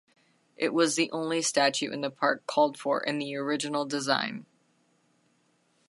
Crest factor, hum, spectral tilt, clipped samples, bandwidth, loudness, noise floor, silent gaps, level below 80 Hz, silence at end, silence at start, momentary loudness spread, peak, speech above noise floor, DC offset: 22 dB; none; -3 dB/octave; under 0.1%; 11.5 kHz; -28 LUFS; -69 dBFS; none; -82 dBFS; 1.45 s; 0.6 s; 7 LU; -8 dBFS; 41 dB; under 0.1%